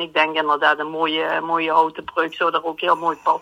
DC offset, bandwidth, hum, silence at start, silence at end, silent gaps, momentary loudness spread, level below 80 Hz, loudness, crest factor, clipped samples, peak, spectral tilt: under 0.1%; 15 kHz; none; 0 s; 0 s; none; 4 LU; -66 dBFS; -20 LUFS; 18 dB; under 0.1%; -2 dBFS; -4.5 dB/octave